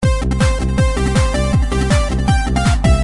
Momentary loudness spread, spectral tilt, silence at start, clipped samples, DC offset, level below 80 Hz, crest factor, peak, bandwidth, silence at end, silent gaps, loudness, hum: 2 LU; -6 dB/octave; 0 s; under 0.1%; 0.5%; -18 dBFS; 12 dB; -2 dBFS; 11.5 kHz; 0 s; none; -16 LUFS; none